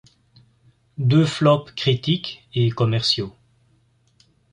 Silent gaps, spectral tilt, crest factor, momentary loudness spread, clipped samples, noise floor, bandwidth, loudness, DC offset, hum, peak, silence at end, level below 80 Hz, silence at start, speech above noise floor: none; -6.5 dB/octave; 18 dB; 8 LU; under 0.1%; -61 dBFS; 10.5 kHz; -20 LUFS; under 0.1%; none; -4 dBFS; 1.25 s; -56 dBFS; 1 s; 41 dB